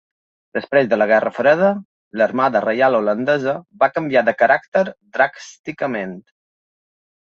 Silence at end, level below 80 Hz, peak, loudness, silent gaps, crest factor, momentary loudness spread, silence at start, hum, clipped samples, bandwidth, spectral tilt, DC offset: 1 s; -66 dBFS; -2 dBFS; -18 LUFS; 1.85-2.11 s, 4.68-4.72 s, 5.59-5.64 s; 16 dB; 13 LU; 0.55 s; none; under 0.1%; 7.4 kHz; -6 dB/octave; under 0.1%